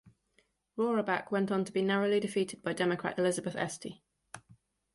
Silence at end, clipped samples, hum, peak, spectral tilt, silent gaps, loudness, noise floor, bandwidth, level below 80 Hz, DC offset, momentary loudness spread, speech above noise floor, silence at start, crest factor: 0.55 s; under 0.1%; none; -16 dBFS; -5 dB/octave; none; -32 LUFS; -73 dBFS; 11.5 kHz; -72 dBFS; under 0.1%; 18 LU; 41 dB; 0.75 s; 18 dB